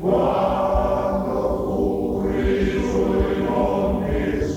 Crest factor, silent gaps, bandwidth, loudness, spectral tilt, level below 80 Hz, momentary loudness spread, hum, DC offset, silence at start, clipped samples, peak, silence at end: 14 dB; none; 17 kHz; -21 LUFS; -7.5 dB/octave; -32 dBFS; 3 LU; none; under 0.1%; 0 s; under 0.1%; -6 dBFS; 0 s